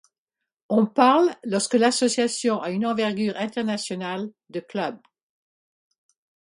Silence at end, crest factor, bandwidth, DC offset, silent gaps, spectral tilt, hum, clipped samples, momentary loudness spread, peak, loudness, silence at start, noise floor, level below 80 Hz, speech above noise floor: 1.6 s; 22 dB; 11.5 kHz; under 0.1%; none; -4 dB/octave; none; under 0.1%; 13 LU; -2 dBFS; -23 LUFS; 0.7 s; -86 dBFS; -72 dBFS; 63 dB